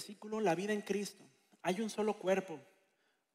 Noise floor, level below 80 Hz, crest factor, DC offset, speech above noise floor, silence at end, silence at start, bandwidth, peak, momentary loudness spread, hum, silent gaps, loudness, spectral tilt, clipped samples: -78 dBFS; -82 dBFS; 18 dB; under 0.1%; 41 dB; 0.7 s; 0 s; 15.5 kHz; -20 dBFS; 11 LU; none; none; -37 LUFS; -5 dB/octave; under 0.1%